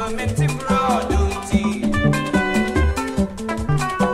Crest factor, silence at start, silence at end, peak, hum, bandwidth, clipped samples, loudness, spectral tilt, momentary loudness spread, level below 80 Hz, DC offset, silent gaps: 16 dB; 0 s; 0 s; -4 dBFS; none; 15.5 kHz; under 0.1%; -20 LUFS; -6 dB/octave; 5 LU; -28 dBFS; under 0.1%; none